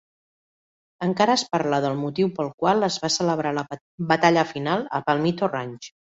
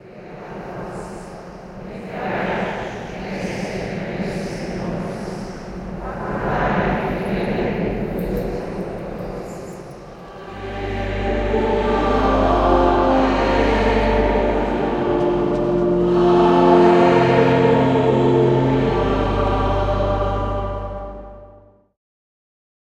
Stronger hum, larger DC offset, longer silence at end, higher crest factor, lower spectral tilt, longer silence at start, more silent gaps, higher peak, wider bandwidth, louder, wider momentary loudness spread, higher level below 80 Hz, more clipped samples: neither; neither; second, 0.25 s vs 1.45 s; about the same, 20 dB vs 18 dB; second, -4.5 dB/octave vs -7.5 dB/octave; first, 1 s vs 0.05 s; first, 2.54-2.58 s, 3.81-3.98 s vs none; about the same, -4 dBFS vs -2 dBFS; second, 8.2 kHz vs 11 kHz; second, -23 LUFS vs -19 LUFS; second, 10 LU vs 19 LU; second, -64 dBFS vs -30 dBFS; neither